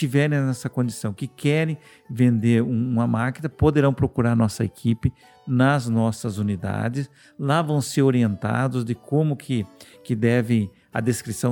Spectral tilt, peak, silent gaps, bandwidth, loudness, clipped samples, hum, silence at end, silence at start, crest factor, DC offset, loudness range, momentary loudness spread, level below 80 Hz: -7 dB/octave; -6 dBFS; none; 18.5 kHz; -23 LUFS; under 0.1%; none; 0 s; 0 s; 16 dB; under 0.1%; 2 LU; 9 LU; -48 dBFS